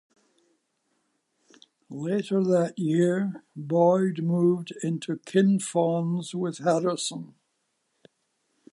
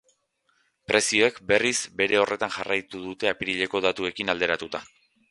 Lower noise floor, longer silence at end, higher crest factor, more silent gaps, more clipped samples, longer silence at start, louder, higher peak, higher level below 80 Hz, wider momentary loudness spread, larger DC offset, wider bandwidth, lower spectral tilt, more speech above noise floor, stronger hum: first, -76 dBFS vs -70 dBFS; first, 1.45 s vs 0.45 s; second, 18 dB vs 24 dB; neither; neither; first, 1.9 s vs 0.9 s; about the same, -25 LUFS vs -24 LUFS; second, -10 dBFS vs -2 dBFS; second, -76 dBFS vs -60 dBFS; first, 10 LU vs 7 LU; neither; about the same, 11.5 kHz vs 11.5 kHz; first, -6.5 dB/octave vs -2.5 dB/octave; first, 51 dB vs 45 dB; neither